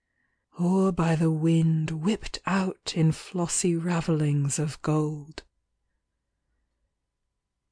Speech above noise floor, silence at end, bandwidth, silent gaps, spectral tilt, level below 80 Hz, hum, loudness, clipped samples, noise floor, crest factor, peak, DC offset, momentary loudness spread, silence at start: 56 dB; 2.4 s; 10.5 kHz; none; -6 dB/octave; -52 dBFS; none; -26 LUFS; under 0.1%; -81 dBFS; 14 dB; -14 dBFS; under 0.1%; 7 LU; 0.55 s